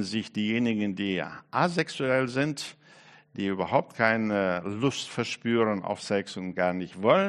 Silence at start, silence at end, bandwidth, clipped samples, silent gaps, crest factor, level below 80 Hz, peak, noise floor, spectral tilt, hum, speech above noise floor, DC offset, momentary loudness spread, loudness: 0 s; 0 s; 11.5 kHz; under 0.1%; none; 22 dB; -68 dBFS; -6 dBFS; -54 dBFS; -5.5 dB/octave; none; 27 dB; under 0.1%; 7 LU; -28 LUFS